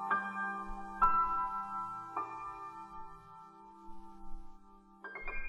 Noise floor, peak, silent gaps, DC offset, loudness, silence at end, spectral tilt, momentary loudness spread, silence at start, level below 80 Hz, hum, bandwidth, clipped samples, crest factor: -58 dBFS; -16 dBFS; none; under 0.1%; -36 LUFS; 0 s; -5.5 dB/octave; 24 LU; 0 s; -50 dBFS; none; 10 kHz; under 0.1%; 22 dB